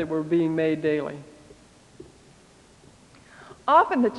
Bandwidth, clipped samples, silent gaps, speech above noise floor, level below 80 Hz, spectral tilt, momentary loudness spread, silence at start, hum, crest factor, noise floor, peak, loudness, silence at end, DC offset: 11 kHz; under 0.1%; none; 31 dB; -62 dBFS; -7 dB/octave; 15 LU; 0 s; none; 20 dB; -54 dBFS; -6 dBFS; -23 LUFS; 0 s; under 0.1%